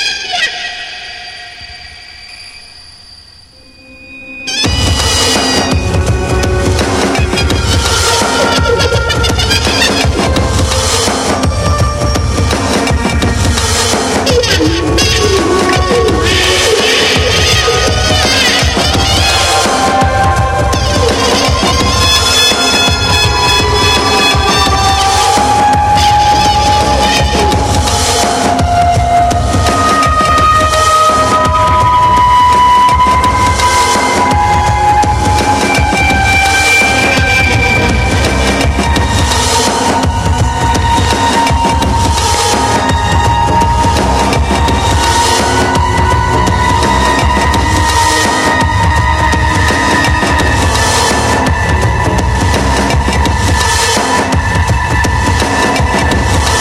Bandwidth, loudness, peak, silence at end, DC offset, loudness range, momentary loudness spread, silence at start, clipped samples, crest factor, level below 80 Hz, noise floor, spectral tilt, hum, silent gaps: 16 kHz; -9 LUFS; 0 dBFS; 0 s; under 0.1%; 4 LU; 4 LU; 0 s; under 0.1%; 10 dB; -18 dBFS; -38 dBFS; -3.5 dB/octave; none; none